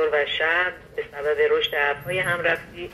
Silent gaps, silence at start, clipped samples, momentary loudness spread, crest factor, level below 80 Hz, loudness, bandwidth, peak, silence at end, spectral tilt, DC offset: none; 0 s; under 0.1%; 8 LU; 16 dB; -54 dBFS; -22 LUFS; 13 kHz; -8 dBFS; 0 s; -4 dB/octave; under 0.1%